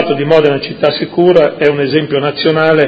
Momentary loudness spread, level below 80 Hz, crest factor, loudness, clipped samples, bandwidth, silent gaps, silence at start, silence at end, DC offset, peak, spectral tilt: 5 LU; -50 dBFS; 10 dB; -11 LUFS; 0.6%; 7.4 kHz; none; 0 s; 0 s; under 0.1%; 0 dBFS; -8 dB/octave